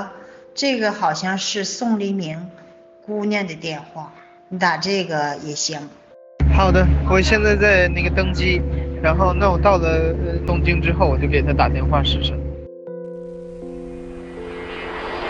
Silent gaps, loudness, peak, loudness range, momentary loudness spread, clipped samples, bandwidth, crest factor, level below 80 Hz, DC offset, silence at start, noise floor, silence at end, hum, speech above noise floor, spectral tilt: none; -19 LUFS; -2 dBFS; 8 LU; 18 LU; under 0.1%; 7.8 kHz; 18 dB; -26 dBFS; under 0.1%; 0 s; -40 dBFS; 0 s; none; 22 dB; -5.5 dB/octave